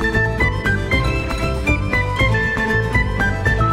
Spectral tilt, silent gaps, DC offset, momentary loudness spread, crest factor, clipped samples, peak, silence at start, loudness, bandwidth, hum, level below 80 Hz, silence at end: -6 dB/octave; none; under 0.1%; 3 LU; 14 dB; under 0.1%; -4 dBFS; 0 s; -18 LUFS; 14.5 kHz; none; -24 dBFS; 0 s